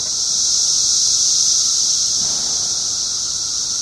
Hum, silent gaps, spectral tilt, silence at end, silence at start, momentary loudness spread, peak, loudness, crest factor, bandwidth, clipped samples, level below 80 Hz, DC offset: none; none; 2 dB/octave; 0 s; 0 s; 6 LU; -2 dBFS; -14 LUFS; 14 dB; 13.5 kHz; under 0.1%; -50 dBFS; under 0.1%